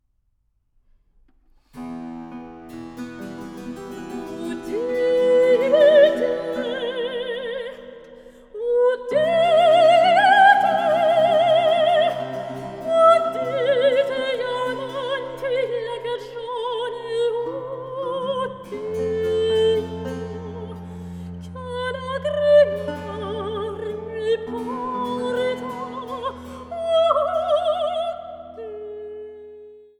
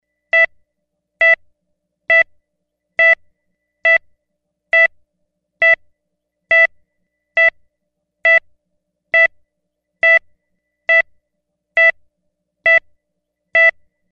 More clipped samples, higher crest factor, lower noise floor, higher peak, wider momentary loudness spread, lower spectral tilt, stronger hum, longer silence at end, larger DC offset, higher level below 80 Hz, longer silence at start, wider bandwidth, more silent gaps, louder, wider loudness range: neither; about the same, 18 dB vs 14 dB; second, -67 dBFS vs -75 dBFS; about the same, -2 dBFS vs -4 dBFS; first, 20 LU vs 6 LU; first, -5 dB/octave vs -1 dB/octave; neither; second, 0.2 s vs 0.4 s; neither; first, -54 dBFS vs -62 dBFS; first, 1.75 s vs 0.35 s; first, 12 kHz vs 7 kHz; neither; second, -20 LUFS vs -13 LUFS; first, 11 LU vs 2 LU